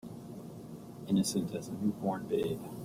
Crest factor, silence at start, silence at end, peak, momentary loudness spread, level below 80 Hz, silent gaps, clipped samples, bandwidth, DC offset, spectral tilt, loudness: 16 dB; 0.05 s; 0 s; -20 dBFS; 16 LU; -66 dBFS; none; under 0.1%; 16 kHz; under 0.1%; -6 dB/octave; -34 LUFS